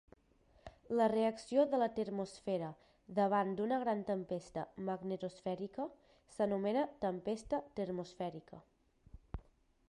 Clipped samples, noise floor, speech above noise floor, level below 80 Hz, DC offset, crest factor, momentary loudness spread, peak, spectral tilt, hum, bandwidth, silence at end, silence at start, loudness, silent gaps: under 0.1%; -69 dBFS; 32 dB; -64 dBFS; under 0.1%; 18 dB; 13 LU; -20 dBFS; -7 dB/octave; none; 11 kHz; 0.5 s; 0.65 s; -38 LUFS; none